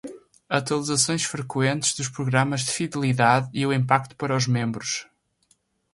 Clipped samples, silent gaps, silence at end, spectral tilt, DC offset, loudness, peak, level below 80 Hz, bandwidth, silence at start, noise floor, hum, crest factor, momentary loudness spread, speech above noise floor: under 0.1%; none; 0.9 s; -4 dB/octave; under 0.1%; -23 LUFS; -2 dBFS; -62 dBFS; 11.5 kHz; 0.05 s; -66 dBFS; none; 22 dB; 7 LU; 43 dB